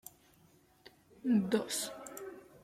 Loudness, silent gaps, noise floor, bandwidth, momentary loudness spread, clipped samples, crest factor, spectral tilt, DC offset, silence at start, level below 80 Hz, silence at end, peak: -35 LUFS; none; -66 dBFS; 15.5 kHz; 18 LU; under 0.1%; 20 dB; -4.5 dB/octave; under 0.1%; 0.85 s; -76 dBFS; 0.05 s; -18 dBFS